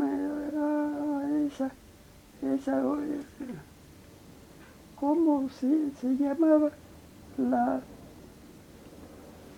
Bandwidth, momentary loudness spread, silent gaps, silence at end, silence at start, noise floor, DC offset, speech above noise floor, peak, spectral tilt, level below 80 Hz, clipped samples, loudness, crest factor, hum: 16 kHz; 24 LU; none; 0 s; 0 s; -53 dBFS; under 0.1%; 26 dB; -12 dBFS; -7 dB/octave; -62 dBFS; under 0.1%; -29 LUFS; 18 dB; none